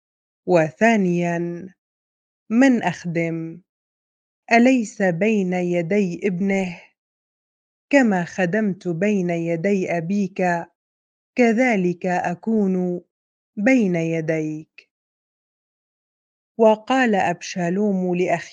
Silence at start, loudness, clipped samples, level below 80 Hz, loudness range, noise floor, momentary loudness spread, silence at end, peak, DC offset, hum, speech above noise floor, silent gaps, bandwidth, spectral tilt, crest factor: 0.45 s; -20 LUFS; under 0.1%; -68 dBFS; 3 LU; under -90 dBFS; 11 LU; 0.05 s; -2 dBFS; under 0.1%; none; over 70 dB; 1.78-2.46 s, 3.69-4.43 s, 6.98-7.88 s, 10.75-11.33 s, 13.11-13.53 s, 14.91-16.55 s; 9.2 kHz; -6.5 dB/octave; 20 dB